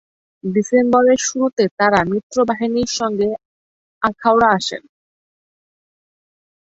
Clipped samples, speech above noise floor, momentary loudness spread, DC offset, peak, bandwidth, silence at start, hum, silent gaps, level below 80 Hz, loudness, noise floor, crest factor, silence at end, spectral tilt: under 0.1%; over 74 dB; 9 LU; under 0.1%; 0 dBFS; 8 kHz; 0.45 s; none; 1.53-1.57 s, 1.71-1.77 s, 2.23-2.30 s, 3.45-4.01 s; -54 dBFS; -17 LUFS; under -90 dBFS; 18 dB; 1.9 s; -4 dB/octave